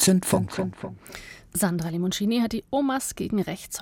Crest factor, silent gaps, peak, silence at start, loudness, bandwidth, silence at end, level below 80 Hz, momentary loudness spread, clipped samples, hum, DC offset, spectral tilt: 18 dB; none; -6 dBFS; 0 s; -26 LUFS; 17 kHz; 0 s; -52 dBFS; 15 LU; under 0.1%; none; under 0.1%; -4.5 dB/octave